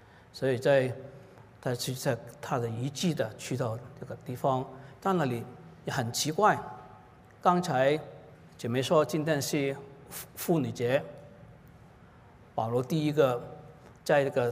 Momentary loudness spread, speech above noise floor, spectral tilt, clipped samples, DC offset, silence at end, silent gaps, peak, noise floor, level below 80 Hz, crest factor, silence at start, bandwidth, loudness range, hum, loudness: 17 LU; 26 dB; -5.5 dB/octave; under 0.1%; under 0.1%; 0 s; none; -10 dBFS; -55 dBFS; -66 dBFS; 20 dB; 0.35 s; 16 kHz; 4 LU; none; -30 LUFS